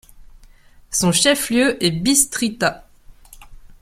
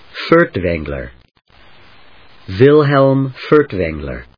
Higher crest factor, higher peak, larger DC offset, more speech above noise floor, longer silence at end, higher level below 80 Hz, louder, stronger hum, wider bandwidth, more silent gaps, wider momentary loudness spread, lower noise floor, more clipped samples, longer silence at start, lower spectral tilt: about the same, 20 dB vs 16 dB; about the same, 0 dBFS vs 0 dBFS; second, under 0.1% vs 0.3%; about the same, 29 dB vs 32 dB; about the same, 0.25 s vs 0.15 s; second, -46 dBFS vs -38 dBFS; second, -17 LUFS vs -13 LUFS; neither; first, 16.5 kHz vs 5.4 kHz; neither; second, 7 LU vs 16 LU; about the same, -47 dBFS vs -46 dBFS; second, under 0.1% vs 0.2%; about the same, 0.15 s vs 0.15 s; second, -3 dB/octave vs -9 dB/octave